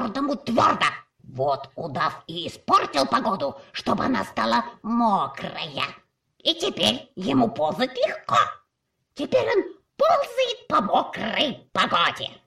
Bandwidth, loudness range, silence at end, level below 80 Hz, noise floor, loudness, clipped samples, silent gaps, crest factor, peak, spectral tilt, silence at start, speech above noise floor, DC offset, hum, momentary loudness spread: 15 kHz; 2 LU; 0.15 s; -58 dBFS; -76 dBFS; -23 LUFS; under 0.1%; none; 18 dB; -6 dBFS; -4.5 dB/octave; 0 s; 52 dB; under 0.1%; none; 10 LU